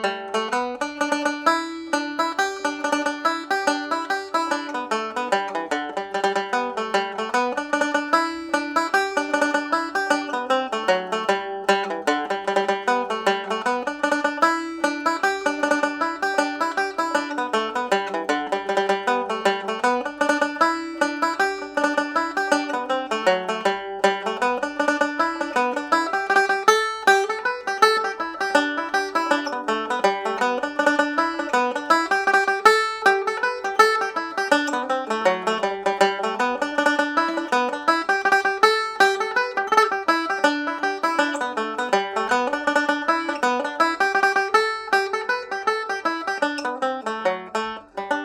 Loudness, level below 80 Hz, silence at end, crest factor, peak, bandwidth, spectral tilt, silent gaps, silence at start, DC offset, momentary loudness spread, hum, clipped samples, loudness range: -22 LUFS; -68 dBFS; 0 s; 20 dB; -2 dBFS; 18 kHz; -2.5 dB/octave; none; 0 s; under 0.1%; 7 LU; none; under 0.1%; 4 LU